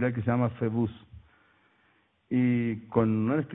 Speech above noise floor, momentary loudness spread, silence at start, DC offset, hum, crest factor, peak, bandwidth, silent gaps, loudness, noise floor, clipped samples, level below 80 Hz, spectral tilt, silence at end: 41 dB; 6 LU; 0 s; under 0.1%; none; 20 dB; -8 dBFS; 3.9 kHz; none; -28 LUFS; -68 dBFS; under 0.1%; -60 dBFS; -12.5 dB/octave; 0 s